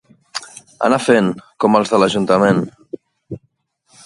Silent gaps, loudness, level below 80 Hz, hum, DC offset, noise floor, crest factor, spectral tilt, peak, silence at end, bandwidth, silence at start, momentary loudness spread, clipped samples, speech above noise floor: none; -15 LUFS; -56 dBFS; none; under 0.1%; -64 dBFS; 18 dB; -5.5 dB/octave; 0 dBFS; 0.7 s; 11.5 kHz; 0.35 s; 21 LU; under 0.1%; 50 dB